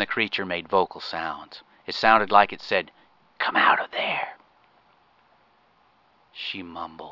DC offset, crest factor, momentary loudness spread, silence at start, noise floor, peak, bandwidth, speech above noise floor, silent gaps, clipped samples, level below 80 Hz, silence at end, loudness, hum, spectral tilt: under 0.1%; 24 dB; 18 LU; 0 s; -62 dBFS; -2 dBFS; 6 kHz; 38 dB; none; under 0.1%; -62 dBFS; 0 s; -23 LUFS; none; -4.5 dB/octave